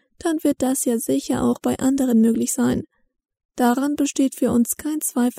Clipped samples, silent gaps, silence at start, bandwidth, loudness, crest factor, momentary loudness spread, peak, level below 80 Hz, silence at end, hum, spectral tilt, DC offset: under 0.1%; 3.45-3.49 s; 0.25 s; 16 kHz; -21 LUFS; 14 dB; 5 LU; -6 dBFS; -54 dBFS; 0 s; none; -4.5 dB/octave; under 0.1%